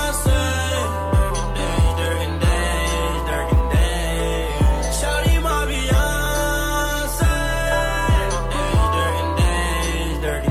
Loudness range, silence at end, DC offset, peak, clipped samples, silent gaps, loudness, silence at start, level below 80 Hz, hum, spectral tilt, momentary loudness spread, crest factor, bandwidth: 1 LU; 0 s; under 0.1%; -6 dBFS; under 0.1%; none; -20 LUFS; 0 s; -22 dBFS; none; -4.5 dB/octave; 4 LU; 12 dB; 15.5 kHz